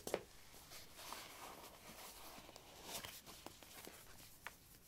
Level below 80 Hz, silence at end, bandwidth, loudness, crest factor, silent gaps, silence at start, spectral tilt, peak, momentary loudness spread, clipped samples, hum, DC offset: -72 dBFS; 0 s; 16 kHz; -54 LUFS; 32 dB; none; 0 s; -2 dB/octave; -22 dBFS; 9 LU; under 0.1%; none; under 0.1%